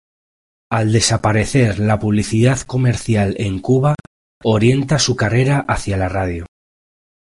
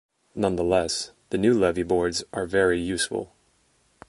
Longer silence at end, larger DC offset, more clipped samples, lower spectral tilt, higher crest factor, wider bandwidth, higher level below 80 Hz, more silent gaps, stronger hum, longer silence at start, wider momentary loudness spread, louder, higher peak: about the same, 0.8 s vs 0.85 s; neither; neither; about the same, -5.5 dB/octave vs -4.5 dB/octave; about the same, 14 dB vs 18 dB; about the same, 11.5 kHz vs 11.5 kHz; first, -36 dBFS vs -48 dBFS; first, 4.07-4.41 s vs none; neither; first, 0.7 s vs 0.35 s; about the same, 7 LU vs 9 LU; first, -16 LUFS vs -24 LUFS; first, -2 dBFS vs -6 dBFS